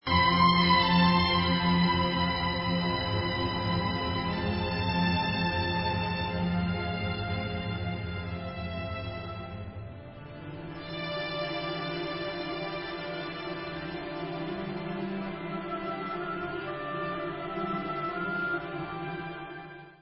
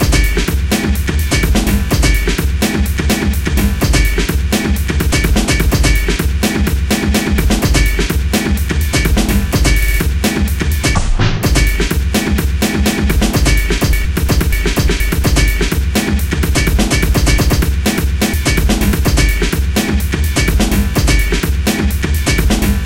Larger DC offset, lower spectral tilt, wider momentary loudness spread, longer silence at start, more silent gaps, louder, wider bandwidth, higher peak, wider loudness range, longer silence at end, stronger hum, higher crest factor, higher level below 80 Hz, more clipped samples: second, under 0.1% vs 0.2%; first, -9.5 dB/octave vs -4.5 dB/octave; first, 15 LU vs 3 LU; about the same, 0.05 s vs 0 s; neither; second, -30 LUFS vs -14 LUFS; second, 5.8 kHz vs 17 kHz; second, -12 dBFS vs 0 dBFS; first, 10 LU vs 1 LU; about the same, 0.05 s vs 0 s; neither; first, 18 dB vs 12 dB; second, -46 dBFS vs -14 dBFS; neither